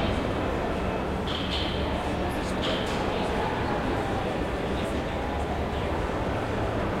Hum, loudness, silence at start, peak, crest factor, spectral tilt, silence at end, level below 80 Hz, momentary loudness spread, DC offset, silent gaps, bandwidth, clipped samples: none; -28 LUFS; 0 s; -14 dBFS; 14 dB; -6 dB/octave; 0 s; -36 dBFS; 2 LU; under 0.1%; none; 16 kHz; under 0.1%